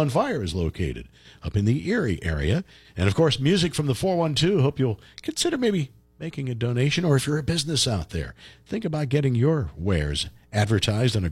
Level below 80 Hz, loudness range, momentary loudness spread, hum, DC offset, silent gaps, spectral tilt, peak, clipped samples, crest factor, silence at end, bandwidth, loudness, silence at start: -40 dBFS; 2 LU; 11 LU; none; under 0.1%; none; -5.5 dB/octave; -6 dBFS; under 0.1%; 16 dB; 0 s; 14.5 kHz; -24 LUFS; 0 s